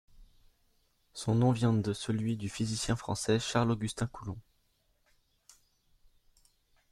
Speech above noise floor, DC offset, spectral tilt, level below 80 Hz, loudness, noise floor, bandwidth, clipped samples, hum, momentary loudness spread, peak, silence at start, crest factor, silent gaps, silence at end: 42 dB; under 0.1%; -5.5 dB/octave; -58 dBFS; -32 LUFS; -73 dBFS; 12.5 kHz; under 0.1%; none; 14 LU; -12 dBFS; 0.2 s; 22 dB; none; 2.5 s